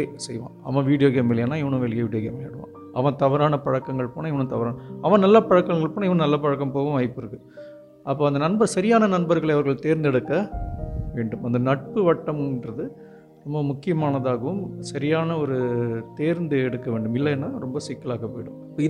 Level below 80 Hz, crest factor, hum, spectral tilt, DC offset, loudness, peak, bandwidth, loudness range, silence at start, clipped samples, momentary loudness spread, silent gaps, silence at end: -46 dBFS; 20 dB; none; -7.5 dB/octave; under 0.1%; -23 LUFS; -4 dBFS; 11.5 kHz; 5 LU; 0 s; under 0.1%; 14 LU; none; 0 s